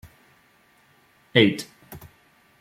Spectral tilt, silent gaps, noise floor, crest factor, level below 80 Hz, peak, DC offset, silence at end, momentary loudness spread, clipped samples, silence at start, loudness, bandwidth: -5.5 dB/octave; none; -60 dBFS; 26 dB; -62 dBFS; -2 dBFS; under 0.1%; 0.6 s; 26 LU; under 0.1%; 1.35 s; -21 LUFS; 16.5 kHz